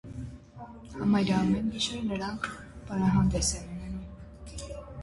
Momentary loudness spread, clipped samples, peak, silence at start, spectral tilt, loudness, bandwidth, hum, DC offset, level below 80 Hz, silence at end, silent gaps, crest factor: 20 LU; under 0.1%; -14 dBFS; 0.05 s; -5 dB/octave; -29 LUFS; 11.5 kHz; none; under 0.1%; -44 dBFS; 0 s; none; 16 dB